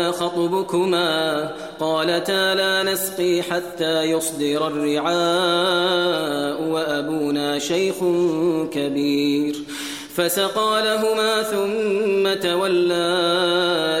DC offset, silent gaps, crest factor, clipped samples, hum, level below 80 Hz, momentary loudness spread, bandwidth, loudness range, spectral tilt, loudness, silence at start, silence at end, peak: 0.1%; none; 14 dB; under 0.1%; none; -62 dBFS; 5 LU; 16.5 kHz; 2 LU; -3.5 dB/octave; -20 LUFS; 0 s; 0 s; -6 dBFS